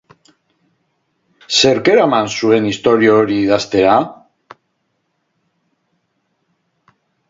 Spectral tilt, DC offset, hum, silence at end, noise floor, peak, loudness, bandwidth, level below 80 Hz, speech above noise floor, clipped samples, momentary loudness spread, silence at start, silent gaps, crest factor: -4 dB/octave; under 0.1%; none; 3.15 s; -68 dBFS; 0 dBFS; -13 LUFS; 7.8 kHz; -54 dBFS; 55 dB; under 0.1%; 4 LU; 1.5 s; none; 16 dB